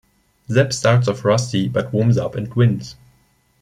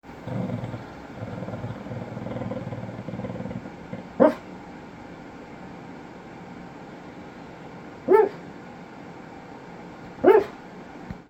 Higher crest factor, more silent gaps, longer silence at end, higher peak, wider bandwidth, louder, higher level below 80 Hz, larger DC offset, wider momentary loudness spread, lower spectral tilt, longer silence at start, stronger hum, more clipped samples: second, 16 dB vs 26 dB; neither; first, 0.7 s vs 0 s; about the same, -2 dBFS vs -2 dBFS; second, 11 kHz vs 12.5 kHz; first, -18 LUFS vs -26 LUFS; about the same, -52 dBFS vs -56 dBFS; neither; second, 6 LU vs 22 LU; second, -6 dB/octave vs -8 dB/octave; first, 0.5 s vs 0.05 s; neither; neither